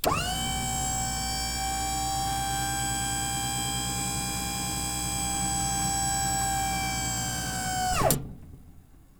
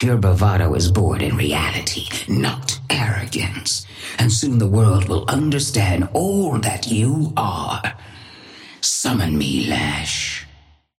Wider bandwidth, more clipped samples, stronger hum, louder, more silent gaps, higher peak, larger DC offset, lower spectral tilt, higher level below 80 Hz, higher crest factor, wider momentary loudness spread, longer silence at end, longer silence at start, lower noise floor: first, over 20 kHz vs 16 kHz; neither; neither; second, -28 LUFS vs -19 LUFS; neither; second, -8 dBFS vs -4 dBFS; neither; second, -2.5 dB/octave vs -4.5 dB/octave; about the same, -40 dBFS vs -38 dBFS; first, 22 dB vs 16 dB; second, 3 LU vs 9 LU; second, 0.2 s vs 0.55 s; about the same, 0 s vs 0 s; about the same, -51 dBFS vs -50 dBFS